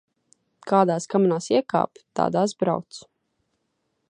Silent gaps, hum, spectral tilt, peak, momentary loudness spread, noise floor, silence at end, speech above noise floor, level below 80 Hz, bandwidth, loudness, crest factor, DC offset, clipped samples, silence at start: none; none; -6 dB/octave; -4 dBFS; 14 LU; -75 dBFS; 1.1 s; 52 dB; -70 dBFS; 10.5 kHz; -23 LUFS; 20 dB; under 0.1%; under 0.1%; 0.65 s